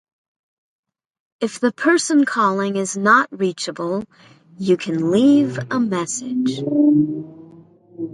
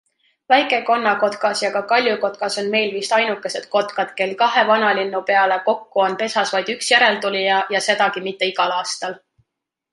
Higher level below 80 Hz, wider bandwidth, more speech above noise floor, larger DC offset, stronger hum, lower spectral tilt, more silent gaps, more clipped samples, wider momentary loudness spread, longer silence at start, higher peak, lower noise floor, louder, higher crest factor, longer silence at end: first, -66 dBFS vs -72 dBFS; about the same, 11.5 kHz vs 11.5 kHz; second, 28 dB vs 60 dB; neither; neither; first, -5 dB/octave vs -2.5 dB/octave; neither; neither; first, 12 LU vs 7 LU; first, 1.4 s vs 0.5 s; about the same, 0 dBFS vs -2 dBFS; second, -46 dBFS vs -79 dBFS; about the same, -18 LUFS vs -18 LUFS; about the same, 18 dB vs 18 dB; second, 0 s vs 0.75 s